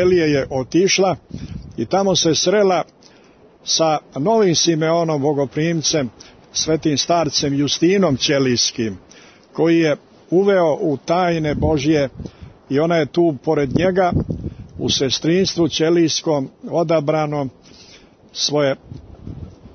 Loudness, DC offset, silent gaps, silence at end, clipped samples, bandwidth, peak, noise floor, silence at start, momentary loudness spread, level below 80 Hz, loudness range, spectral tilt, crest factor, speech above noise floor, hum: -18 LUFS; under 0.1%; none; 0.05 s; under 0.1%; 6.6 kHz; -4 dBFS; -48 dBFS; 0 s; 14 LU; -44 dBFS; 2 LU; -4.5 dB/octave; 14 dB; 31 dB; none